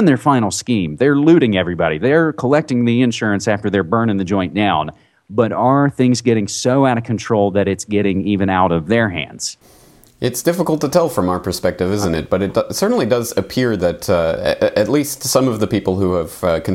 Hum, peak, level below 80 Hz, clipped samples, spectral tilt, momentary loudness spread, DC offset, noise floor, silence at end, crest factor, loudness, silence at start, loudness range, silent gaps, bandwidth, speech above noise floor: none; 0 dBFS; -48 dBFS; under 0.1%; -5.5 dB/octave; 5 LU; under 0.1%; -47 dBFS; 0 s; 16 dB; -16 LUFS; 0 s; 3 LU; none; 17 kHz; 32 dB